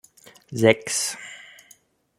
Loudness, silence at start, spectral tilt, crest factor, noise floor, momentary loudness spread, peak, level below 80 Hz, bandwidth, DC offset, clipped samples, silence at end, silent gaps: -21 LUFS; 0.5 s; -3.5 dB/octave; 24 dB; -57 dBFS; 20 LU; -2 dBFS; -66 dBFS; 16.5 kHz; under 0.1%; under 0.1%; 0.75 s; none